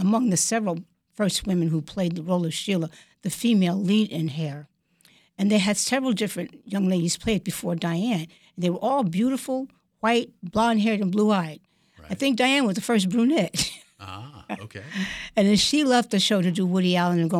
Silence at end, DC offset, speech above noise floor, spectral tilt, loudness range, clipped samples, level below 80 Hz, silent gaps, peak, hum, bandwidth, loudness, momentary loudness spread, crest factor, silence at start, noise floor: 0 s; under 0.1%; 37 dB; -4.5 dB/octave; 3 LU; under 0.1%; -56 dBFS; none; -8 dBFS; none; 15 kHz; -23 LUFS; 14 LU; 16 dB; 0 s; -60 dBFS